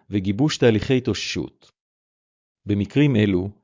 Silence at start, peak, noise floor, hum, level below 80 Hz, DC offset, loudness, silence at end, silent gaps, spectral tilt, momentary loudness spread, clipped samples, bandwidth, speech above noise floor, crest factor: 0.1 s; -6 dBFS; under -90 dBFS; none; -46 dBFS; under 0.1%; -21 LUFS; 0.1 s; 1.81-2.55 s; -6.5 dB/octave; 9 LU; under 0.1%; 7.6 kHz; over 69 dB; 16 dB